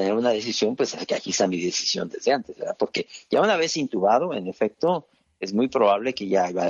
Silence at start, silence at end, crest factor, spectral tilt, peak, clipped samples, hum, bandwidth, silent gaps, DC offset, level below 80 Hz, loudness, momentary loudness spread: 0 s; 0 s; 16 dB; -3.5 dB/octave; -6 dBFS; under 0.1%; none; 7.8 kHz; none; under 0.1%; -68 dBFS; -24 LUFS; 7 LU